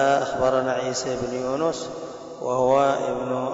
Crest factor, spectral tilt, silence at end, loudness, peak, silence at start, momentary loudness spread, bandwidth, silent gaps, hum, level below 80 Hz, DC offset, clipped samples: 14 dB; -4.5 dB/octave; 0 s; -24 LUFS; -10 dBFS; 0 s; 13 LU; 8 kHz; none; none; -54 dBFS; under 0.1%; under 0.1%